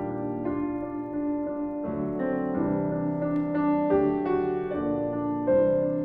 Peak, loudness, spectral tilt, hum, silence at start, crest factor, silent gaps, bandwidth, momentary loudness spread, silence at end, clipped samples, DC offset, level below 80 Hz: -12 dBFS; -27 LUFS; -11.5 dB/octave; none; 0 s; 14 dB; none; 3.8 kHz; 8 LU; 0 s; under 0.1%; under 0.1%; -52 dBFS